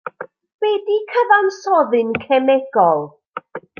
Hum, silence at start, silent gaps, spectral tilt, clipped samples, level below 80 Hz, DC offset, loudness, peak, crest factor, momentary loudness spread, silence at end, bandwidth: none; 0.05 s; 0.54-0.59 s, 3.28-3.32 s; -5.5 dB/octave; under 0.1%; -66 dBFS; under 0.1%; -16 LUFS; -2 dBFS; 16 dB; 18 LU; 0.2 s; 7 kHz